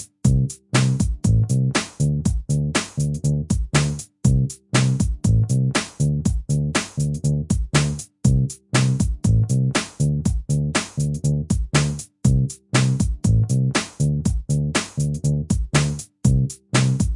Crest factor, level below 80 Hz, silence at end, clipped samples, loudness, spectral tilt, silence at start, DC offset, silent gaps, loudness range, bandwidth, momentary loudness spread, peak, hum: 18 dB; -30 dBFS; 0 s; under 0.1%; -21 LUFS; -5.5 dB/octave; 0 s; under 0.1%; none; 1 LU; 11.5 kHz; 4 LU; -2 dBFS; none